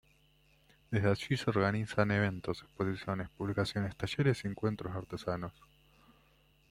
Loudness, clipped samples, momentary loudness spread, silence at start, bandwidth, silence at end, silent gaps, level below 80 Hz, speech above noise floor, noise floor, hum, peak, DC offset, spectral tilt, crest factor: -34 LUFS; under 0.1%; 9 LU; 0.9 s; 14 kHz; 1.2 s; none; -62 dBFS; 34 dB; -67 dBFS; none; -12 dBFS; under 0.1%; -6.5 dB/octave; 22 dB